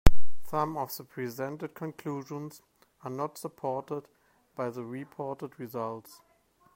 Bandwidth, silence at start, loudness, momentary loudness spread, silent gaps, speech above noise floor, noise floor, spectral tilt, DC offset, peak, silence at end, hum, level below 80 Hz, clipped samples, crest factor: 16 kHz; 0.05 s; -36 LUFS; 13 LU; none; 31 dB; -66 dBFS; -6.5 dB/octave; under 0.1%; -2 dBFS; 0 s; none; -38 dBFS; under 0.1%; 24 dB